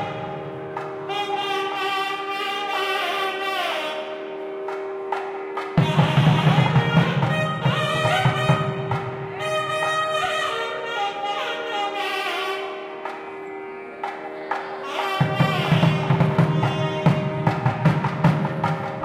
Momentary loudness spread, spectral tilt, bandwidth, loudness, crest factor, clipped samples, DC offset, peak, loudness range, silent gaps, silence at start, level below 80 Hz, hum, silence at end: 13 LU; -6 dB/octave; 15 kHz; -23 LUFS; 18 dB; under 0.1%; under 0.1%; -4 dBFS; 7 LU; none; 0 s; -54 dBFS; none; 0 s